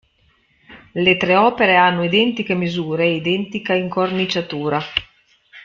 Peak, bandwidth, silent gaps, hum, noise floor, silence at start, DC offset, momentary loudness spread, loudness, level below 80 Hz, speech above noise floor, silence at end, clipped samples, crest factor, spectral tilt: 0 dBFS; 7.2 kHz; none; none; -59 dBFS; 0.7 s; under 0.1%; 8 LU; -17 LUFS; -54 dBFS; 42 dB; 0.05 s; under 0.1%; 18 dB; -6 dB/octave